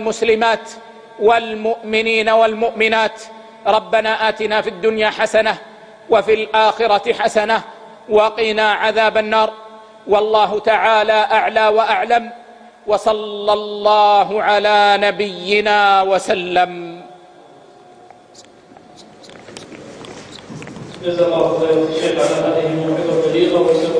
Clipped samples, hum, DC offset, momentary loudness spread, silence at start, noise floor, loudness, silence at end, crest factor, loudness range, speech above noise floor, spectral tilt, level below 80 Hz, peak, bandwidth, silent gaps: under 0.1%; none; under 0.1%; 20 LU; 0 s; -44 dBFS; -15 LUFS; 0 s; 16 dB; 7 LU; 29 dB; -4 dB/octave; -56 dBFS; 0 dBFS; 10.5 kHz; none